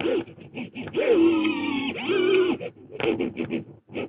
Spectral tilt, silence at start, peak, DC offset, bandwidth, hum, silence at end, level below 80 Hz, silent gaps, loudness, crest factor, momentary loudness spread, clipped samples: -9.5 dB/octave; 0 s; -10 dBFS; under 0.1%; 4.9 kHz; none; 0 s; -62 dBFS; none; -24 LUFS; 16 dB; 17 LU; under 0.1%